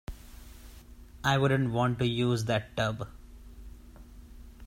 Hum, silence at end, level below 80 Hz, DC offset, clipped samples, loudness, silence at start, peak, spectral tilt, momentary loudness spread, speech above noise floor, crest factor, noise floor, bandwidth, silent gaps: none; 0 s; -50 dBFS; under 0.1%; under 0.1%; -29 LUFS; 0.1 s; -12 dBFS; -6 dB/octave; 24 LU; 22 dB; 20 dB; -50 dBFS; 16 kHz; none